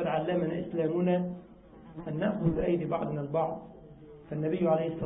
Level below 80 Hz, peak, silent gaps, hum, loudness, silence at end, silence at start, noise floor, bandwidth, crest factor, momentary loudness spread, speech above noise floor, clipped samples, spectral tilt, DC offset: -56 dBFS; -14 dBFS; none; none; -31 LUFS; 0 s; 0 s; -50 dBFS; 3.8 kHz; 16 dB; 19 LU; 20 dB; under 0.1%; -11.5 dB/octave; under 0.1%